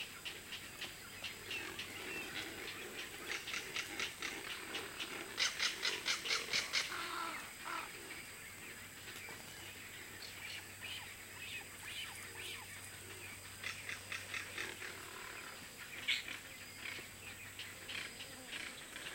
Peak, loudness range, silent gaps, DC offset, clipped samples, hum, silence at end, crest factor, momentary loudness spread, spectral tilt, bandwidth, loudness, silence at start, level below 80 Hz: -20 dBFS; 9 LU; none; under 0.1%; under 0.1%; none; 0 s; 26 dB; 13 LU; -1 dB/octave; 16.5 kHz; -43 LUFS; 0 s; -72 dBFS